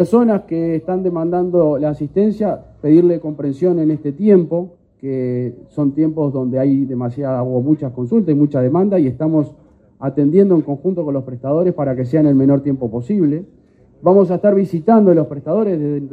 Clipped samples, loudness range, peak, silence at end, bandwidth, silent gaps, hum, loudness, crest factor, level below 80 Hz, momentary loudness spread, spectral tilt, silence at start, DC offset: under 0.1%; 2 LU; 0 dBFS; 0 s; 8 kHz; none; none; -16 LUFS; 16 dB; -54 dBFS; 9 LU; -11 dB/octave; 0 s; under 0.1%